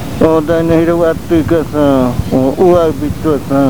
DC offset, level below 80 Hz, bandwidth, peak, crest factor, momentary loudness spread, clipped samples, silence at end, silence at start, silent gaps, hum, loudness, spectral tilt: 4%; -30 dBFS; over 20 kHz; 0 dBFS; 10 dB; 5 LU; 0.2%; 0 s; 0 s; none; none; -11 LUFS; -7.5 dB/octave